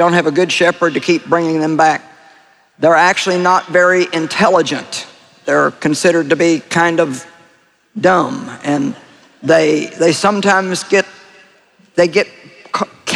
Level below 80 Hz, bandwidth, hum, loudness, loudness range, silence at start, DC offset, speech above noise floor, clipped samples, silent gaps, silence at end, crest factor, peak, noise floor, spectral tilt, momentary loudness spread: -60 dBFS; 13 kHz; none; -14 LUFS; 3 LU; 0 s; under 0.1%; 39 dB; under 0.1%; none; 0 s; 14 dB; 0 dBFS; -52 dBFS; -4.5 dB/octave; 11 LU